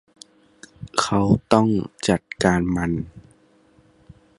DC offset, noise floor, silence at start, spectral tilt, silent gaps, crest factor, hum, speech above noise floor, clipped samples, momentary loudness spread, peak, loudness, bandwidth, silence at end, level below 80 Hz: under 0.1%; -56 dBFS; 0.8 s; -5.5 dB/octave; none; 22 dB; none; 36 dB; under 0.1%; 10 LU; 0 dBFS; -21 LUFS; 11.5 kHz; 1.2 s; -44 dBFS